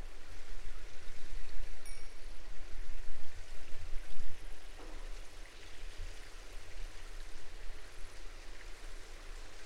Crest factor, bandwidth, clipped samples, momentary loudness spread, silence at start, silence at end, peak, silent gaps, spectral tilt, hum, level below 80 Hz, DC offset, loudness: 12 dB; 11 kHz; under 0.1%; 3 LU; 0 s; 0 s; -16 dBFS; none; -3.5 dB/octave; none; -44 dBFS; under 0.1%; -52 LUFS